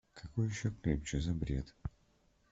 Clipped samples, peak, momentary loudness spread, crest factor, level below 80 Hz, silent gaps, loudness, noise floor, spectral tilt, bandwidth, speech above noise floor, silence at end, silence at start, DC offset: under 0.1%; -20 dBFS; 11 LU; 18 dB; -48 dBFS; none; -38 LUFS; -71 dBFS; -6.5 dB/octave; 8 kHz; 35 dB; 0.65 s; 0.15 s; under 0.1%